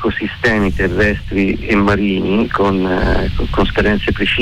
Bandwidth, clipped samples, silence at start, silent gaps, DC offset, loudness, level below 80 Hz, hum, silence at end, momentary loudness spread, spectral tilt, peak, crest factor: 11.5 kHz; under 0.1%; 0 s; none; under 0.1%; -15 LUFS; -24 dBFS; none; 0 s; 3 LU; -7 dB/octave; -4 dBFS; 10 dB